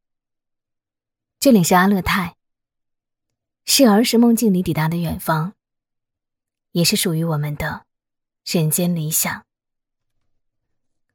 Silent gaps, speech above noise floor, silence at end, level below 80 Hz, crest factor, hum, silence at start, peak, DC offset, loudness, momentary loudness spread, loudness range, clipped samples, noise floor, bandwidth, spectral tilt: none; 68 dB; 1.75 s; -48 dBFS; 18 dB; none; 1.4 s; -2 dBFS; under 0.1%; -17 LUFS; 14 LU; 6 LU; under 0.1%; -84 dBFS; 18 kHz; -4.5 dB/octave